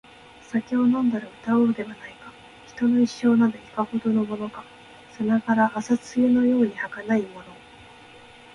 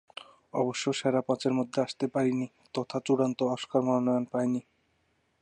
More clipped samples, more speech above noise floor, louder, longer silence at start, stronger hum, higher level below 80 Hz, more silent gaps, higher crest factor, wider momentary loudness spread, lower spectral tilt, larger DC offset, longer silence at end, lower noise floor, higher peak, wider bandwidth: neither; second, 25 dB vs 44 dB; first, -23 LUFS vs -29 LUFS; about the same, 0.5 s vs 0.55 s; neither; first, -62 dBFS vs -76 dBFS; neither; about the same, 14 dB vs 16 dB; first, 18 LU vs 9 LU; about the same, -6.5 dB/octave vs -5.5 dB/octave; neither; first, 1 s vs 0.8 s; second, -47 dBFS vs -72 dBFS; about the same, -10 dBFS vs -12 dBFS; about the same, 10 kHz vs 9.8 kHz